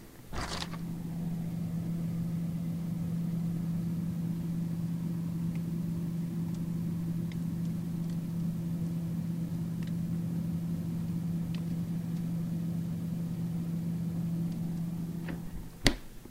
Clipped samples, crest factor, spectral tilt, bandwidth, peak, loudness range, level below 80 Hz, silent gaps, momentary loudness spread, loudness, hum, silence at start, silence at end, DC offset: under 0.1%; 30 dB; -6.5 dB/octave; 16 kHz; -4 dBFS; 1 LU; -50 dBFS; none; 3 LU; -35 LUFS; none; 0 s; 0 s; under 0.1%